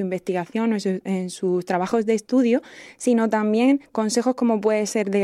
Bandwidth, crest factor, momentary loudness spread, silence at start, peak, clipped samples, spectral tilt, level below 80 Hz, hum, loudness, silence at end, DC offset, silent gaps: 13.5 kHz; 14 dB; 6 LU; 0 s; -8 dBFS; under 0.1%; -5.5 dB/octave; -70 dBFS; none; -22 LUFS; 0 s; under 0.1%; none